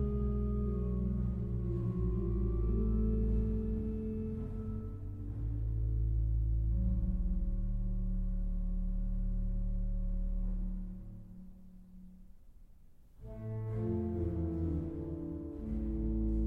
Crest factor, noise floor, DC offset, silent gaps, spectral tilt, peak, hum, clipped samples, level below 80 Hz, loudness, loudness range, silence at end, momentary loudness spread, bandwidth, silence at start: 12 dB; -56 dBFS; under 0.1%; none; -12 dB/octave; -22 dBFS; none; under 0.1%; -36 dBFS; -37 LUFS; 9 LU; 0 s; 11 LU; 2.3 kHz; 0 s